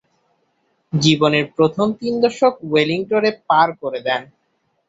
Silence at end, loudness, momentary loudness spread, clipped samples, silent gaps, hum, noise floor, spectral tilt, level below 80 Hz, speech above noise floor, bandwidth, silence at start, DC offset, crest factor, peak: 0.65 s; -18 LUFS; 7 LU; under 0.1%; none; none; -67 dBFS; -5.5 dB/octave; -60 dBFS; 50 dB; 8 kHz; 0.95 s; under 0.1%; 16 dB; -2 dBFS